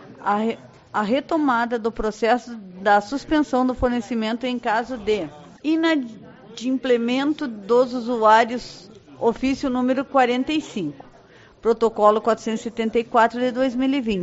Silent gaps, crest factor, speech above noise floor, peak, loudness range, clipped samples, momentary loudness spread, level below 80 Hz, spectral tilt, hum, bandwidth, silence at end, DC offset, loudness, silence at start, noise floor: none; 18 dB; 28 dB; -2 dBFS; 3 LU; under 0.1%; 10 LU; -48 dBFS; -3 dB/octave; none; 8 kHz; 0 s; under 0.1%; -21 LUFS; 0 s; -49 dBFS